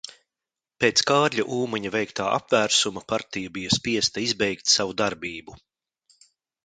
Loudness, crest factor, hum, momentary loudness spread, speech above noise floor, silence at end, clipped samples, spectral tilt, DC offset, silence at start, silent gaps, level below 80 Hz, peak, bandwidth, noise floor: -23 LUFS; 22 dB; none; 12 LU; 65 dB; 1.1 s; under 0.1%; -2.5 dB/octave; under 0.1%; 0.05 s; none; -58 dBFS; -4 dBFS; 10.5 kHz; -89 dBFS